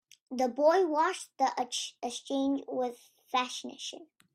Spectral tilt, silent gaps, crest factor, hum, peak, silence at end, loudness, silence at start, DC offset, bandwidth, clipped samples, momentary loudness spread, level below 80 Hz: -2 dB/octave; none; 18 dB; none; -14 dBFS; 0.3 s; -31 LUFS; 0.3 s; under 0.1%; 14 kHz; under 0.1%; 15 LU; -80 dBFS